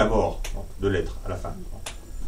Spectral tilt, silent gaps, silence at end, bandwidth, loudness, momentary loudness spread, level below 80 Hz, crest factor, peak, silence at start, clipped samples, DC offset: -6 dB/octave; none; 0 s; 16 kHz; -29 LUFS; 13 LU; -32 dBFS; 18 dB; -8 dBFS; 0 s; under 0.1%; under 0.1%